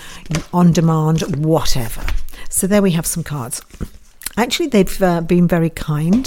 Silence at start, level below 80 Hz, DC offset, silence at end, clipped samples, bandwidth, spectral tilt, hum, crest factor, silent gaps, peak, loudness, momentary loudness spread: 0 s; -30 dBFS; under 0.1%; 0 s; under 0.1%; 17 kHz; -5.5 dB/octave; none; 16 dB; none; 0 dBFS; -17 LUFS; 13 LU